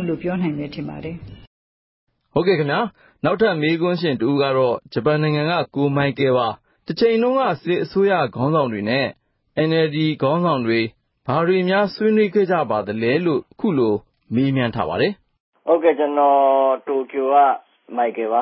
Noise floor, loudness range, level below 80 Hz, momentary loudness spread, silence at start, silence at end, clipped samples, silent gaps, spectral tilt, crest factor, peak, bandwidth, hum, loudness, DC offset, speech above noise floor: under -90 dBFS; 3 LU; -56 dBFS; 10 LU; 0 s; 0 s; under 0.1%; 1.47-2.07 s, 15.40-15.52 s; -11.5 dB/octave; 14 dB; -4 dBFS; 5.8 kHz; none; -19 LUFS; under 0.1%; over 71 dB